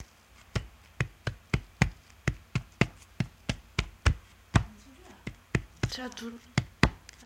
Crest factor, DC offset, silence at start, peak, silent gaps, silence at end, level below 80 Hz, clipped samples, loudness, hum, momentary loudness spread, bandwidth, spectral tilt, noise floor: 30 dB; under 0.1%; 0 s; -2 dBFS; none; 0.3 s; -40 dBFS; under 0.1%; -33 LUFS; none; 16 LU; 16 kHz; -5.5 dB/octave; -57 dBFS